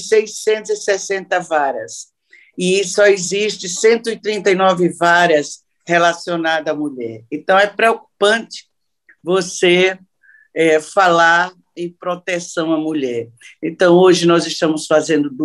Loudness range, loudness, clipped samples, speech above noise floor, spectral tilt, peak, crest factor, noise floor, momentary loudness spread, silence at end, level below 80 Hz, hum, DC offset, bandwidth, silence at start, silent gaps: 3 LU; -15 LUFS; under 0.1%; 39 dB; -4 dB/octave; 0 dBFS; 16 dB; -55 dBFS; 15 LU; 0 s; -66 dBFS; none; under 0.1%; 12 kHz; 0 s; none